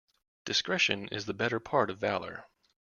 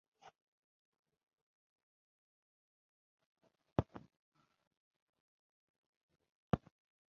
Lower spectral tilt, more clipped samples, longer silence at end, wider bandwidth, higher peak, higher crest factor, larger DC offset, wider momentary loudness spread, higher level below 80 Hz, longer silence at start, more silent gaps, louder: second, -3.5 dB/octave vs -7.5 dB/octave; neither; about the same, 0.55 s vs 0.55 s; about the same, 7.4 kHz vs 6.8 kHz; first, -10 dBFS vs -16 dBFS; second, 22 dB vs 34 dB; neither; about the same, 15 LU vs 13 LU; about the same, -68 dBFS vs -64 dBFS; second, 0.45 s vs 3.8 s; second, none vs 4.19-4.32 s, 4.67-4.71 s, 4.77-5.13 s, 5.20-6.09 s, 6.29-6.50 s; first, -30 LUFS vs -42 LUFS